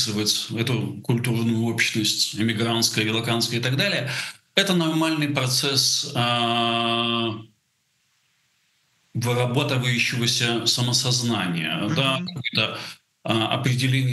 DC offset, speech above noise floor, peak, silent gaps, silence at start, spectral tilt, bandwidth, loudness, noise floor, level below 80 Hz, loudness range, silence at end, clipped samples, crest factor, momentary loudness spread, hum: under 0.1%; 47 dB; -2 dBFS; none; 0 s; -3.5 dB/octave; 12.5 kHz; -22 LUFS; -69 dBFS; -66 dBFS; 4 LU; 0 s; under 0.1%; 22 dB; 6 LU; none